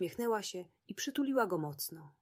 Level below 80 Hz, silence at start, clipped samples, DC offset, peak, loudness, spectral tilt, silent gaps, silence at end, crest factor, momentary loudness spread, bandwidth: -78 dBFS; 0 s; under 0.1%; under 0.1%; -20 dBFS; -36 LUFS; -4 dB/octave; none; 0.1 s; 18 dB; 11 LU; 16 kHz